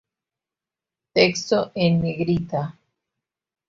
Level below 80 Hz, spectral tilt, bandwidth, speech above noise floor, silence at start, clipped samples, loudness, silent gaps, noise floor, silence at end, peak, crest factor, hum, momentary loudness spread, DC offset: -54 dBFS; -5.5 dB/octave; 7.6 kHz; 68 dB; 1.15 s; under 0.1%; -22 LUFS; none; -89 dBFS; 1 s; -4 dBFS; 20 dB; none; 9 LU; under 0.1%